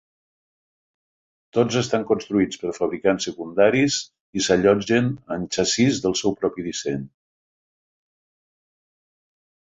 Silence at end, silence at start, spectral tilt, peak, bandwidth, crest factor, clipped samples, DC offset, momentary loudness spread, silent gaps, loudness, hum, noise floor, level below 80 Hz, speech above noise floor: 2.65 s; 1.55 s; -4.5 dB/octave; -2 dBFS; 8 kHz; 22 dB; under 0.1%; under 0.1%; 9 LU; 4.20-4.33 s; -22 LUFS; none; under -90 dBFS; -56 dBFS; over 69 dB